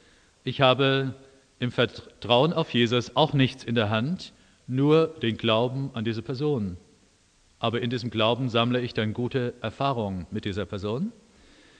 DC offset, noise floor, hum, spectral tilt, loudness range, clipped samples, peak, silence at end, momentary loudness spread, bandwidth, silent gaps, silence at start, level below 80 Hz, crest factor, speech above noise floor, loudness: under 0.1%; -62 dBFS; none; -6.5 dB/octave; 4 LU; under 0.1%; -4 dBFS; 0.7 s; 11 LU; 9.4 kHz; none; 0.45 s; -58 dBFS; 22 dB; 36 dB; -26 LUFS